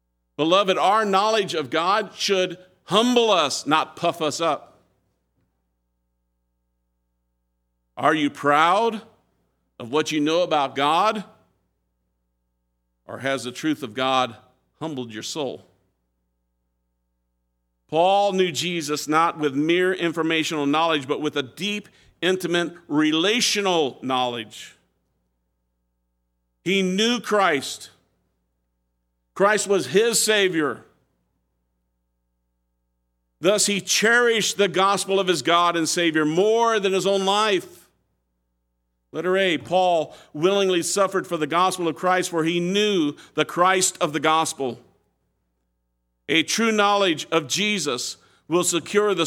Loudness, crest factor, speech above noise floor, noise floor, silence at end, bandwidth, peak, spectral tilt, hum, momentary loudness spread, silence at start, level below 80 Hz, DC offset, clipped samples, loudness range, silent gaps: -21 LUFS; 22 dB; 52 dB; -74 dBFS; 0 s; 17 kHz; -2 dBFS; -3 dB/octave; 60 Hz at -60 dBFS; 10 LU; 0.4 s; -72 dBFS; under 0.1%; under 0.1%; 8 LU; none